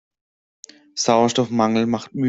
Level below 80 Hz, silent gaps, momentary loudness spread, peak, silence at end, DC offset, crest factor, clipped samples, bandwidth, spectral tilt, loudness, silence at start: -60 dBFS; none; 7 LU; -2 dBFS; 0 s; under 0.1%; 18 dB; under 0.1%; 8 kHz; -4.5 dB/octave; -19 LUFS; 0.95 s